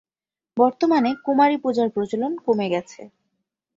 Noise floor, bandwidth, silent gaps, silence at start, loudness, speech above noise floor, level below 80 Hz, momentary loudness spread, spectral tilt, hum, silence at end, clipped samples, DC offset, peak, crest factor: under -90 dBFS; 7.8 kHz; none; 0.55 s; -21 LUFS; over 70 dB; -68 dBFS; 7 LU; -6.5 dB/octave; none; 0.7 s; under 0.1%; under 0.1%; -4 dBFS; 18 dB